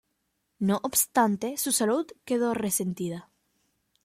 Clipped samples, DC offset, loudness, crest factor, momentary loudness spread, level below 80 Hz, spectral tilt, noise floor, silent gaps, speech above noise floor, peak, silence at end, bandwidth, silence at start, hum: under 0.1%; under 0.1%; -27 LUFS; 20 dB; 8 LU; -68 dBFS; -4 dB/octave; -77 dBFS; none; 50 dB; -8 dBFS; 0.85 s; 16.5 kHz; 0.6 s; none